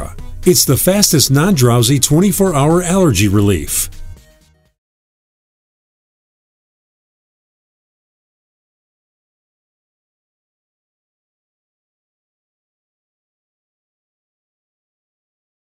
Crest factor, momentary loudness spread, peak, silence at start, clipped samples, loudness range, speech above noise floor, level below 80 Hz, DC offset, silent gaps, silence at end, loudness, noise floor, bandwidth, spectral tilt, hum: 18 dB; 7 LU; 0 dBFS; 0 s; under 0.1%; 12 LU; 40 dB; -36 dBFS; under 0.1%; none; 11.6 s; -12 LUFS; -51 dBFS; 16.5 kHz; -4.5 dB/octave; none